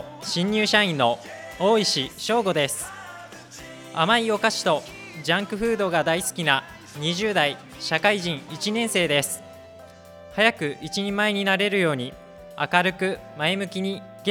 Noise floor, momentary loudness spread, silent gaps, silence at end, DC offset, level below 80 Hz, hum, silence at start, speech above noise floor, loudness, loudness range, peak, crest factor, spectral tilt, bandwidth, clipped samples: -45 dBFS; 14 LU; none; 0 s; under 0.1%; -58 dBFS; none; 0 s; 22 dB; -23 LUFS; 2 LU; -2 dBFS; 22 dB; -3.5 dB/octave; 18.5 kHz; under 0.1%